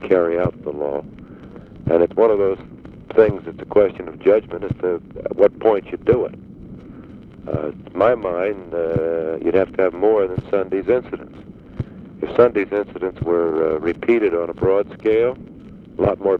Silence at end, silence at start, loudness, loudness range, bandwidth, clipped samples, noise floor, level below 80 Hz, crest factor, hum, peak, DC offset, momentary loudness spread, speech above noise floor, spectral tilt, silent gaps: 0 s; 0 s; -19 LUFS; 3 LU; 4.8 kHz; under 0.1%; -39 dBFS; -46 dBFS; 18 dB; none; -2 dBFS; under 0.1%; 22 LU; 20 dB; -9.5 dB/octave; none